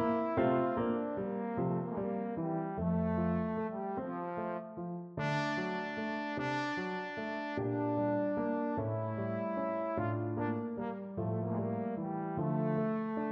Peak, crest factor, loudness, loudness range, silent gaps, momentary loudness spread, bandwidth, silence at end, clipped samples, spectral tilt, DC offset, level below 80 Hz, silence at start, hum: -18 dBFS; 16 dB; -36 LUFS; 2 LU; none; 6 LU; 7.8 kHz; 0 s; under 0.1%; -8.5 dB/octave; under 0.1%; -62 dBFS; 0 s; none